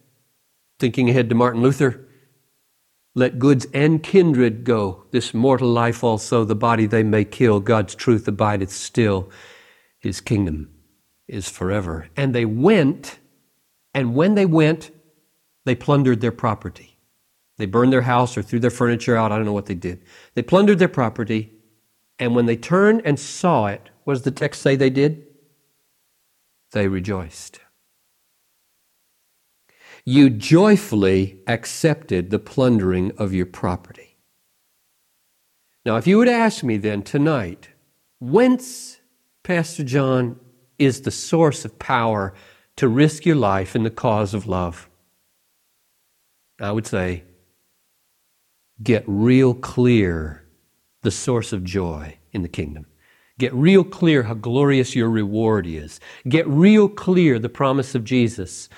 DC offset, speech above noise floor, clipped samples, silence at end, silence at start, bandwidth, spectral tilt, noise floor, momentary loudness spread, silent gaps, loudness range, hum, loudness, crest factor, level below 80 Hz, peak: under 0.1%; 48 dB; under 0.1%; 0.15 s; 0.8 s; 14.5 kHz; -6.5 dB/octave; -66 dBFS; 14 LU; none; 8 LU; none; -19 LUFS; 18 dB; -52 dBFS; -2 dBFS